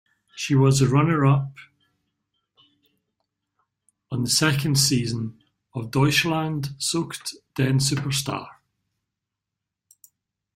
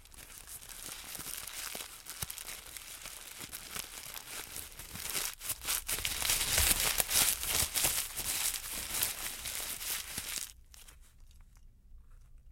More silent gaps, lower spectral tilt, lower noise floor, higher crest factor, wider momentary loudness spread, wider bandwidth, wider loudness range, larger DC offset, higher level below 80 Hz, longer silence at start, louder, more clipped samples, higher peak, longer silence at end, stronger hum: neither; first, -4.5 dB/octave vs 0 dB/octave; first, -85 dBFS vs -57 dBFS; second, 20 dB vs 32 dB; second, 14 LU vs 17 LU; about the same, 16 kHz vs 17 kHz; second, 6 LU vs 12 LU; neither; about the same, -56 dBFS vs -52 dBFS; first, 0.35 s vs 0 s; first, -22 LUFS vs -33 LUFS; neither; about the same, -4 dBFS vs -6 dBFS; first, 2.05 s vs 0 s; neither